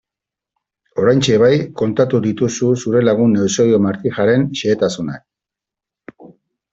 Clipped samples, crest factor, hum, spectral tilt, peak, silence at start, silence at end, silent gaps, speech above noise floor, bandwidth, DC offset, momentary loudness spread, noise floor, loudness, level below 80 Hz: under 0.1%; 14 dB; none; -6 dB/octave; -2 dBFS; 0.95 s; 0.45 s; none; 71 dB; 8 kHz; under 0.1%; 7 LU; -86 dBFS; -15 LUFS; -54 dBFS